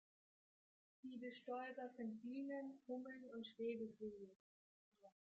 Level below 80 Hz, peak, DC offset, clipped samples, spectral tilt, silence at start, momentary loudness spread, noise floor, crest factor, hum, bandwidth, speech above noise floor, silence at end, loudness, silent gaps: under -90 dBFS; -36 dBFS; under 0.1%; under 0.1%; -4 dB/octave; 1.05 s; 8 LU; under -90 dBFS; 16 dB; none; 7.6 kHz; over 39 dB; 0.2 s; -52 LUFS; 4.36-4.92 s